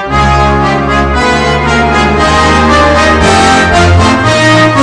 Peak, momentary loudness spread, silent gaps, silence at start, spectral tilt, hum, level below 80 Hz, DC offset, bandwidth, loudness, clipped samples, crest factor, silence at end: 0 dBFS; 3 LU; none; 0 s; -5 dB/octave; none; -18 dBFS; under 0.1%; 11 kHz; -7 LUFS; 2%; 6 dB; 0 s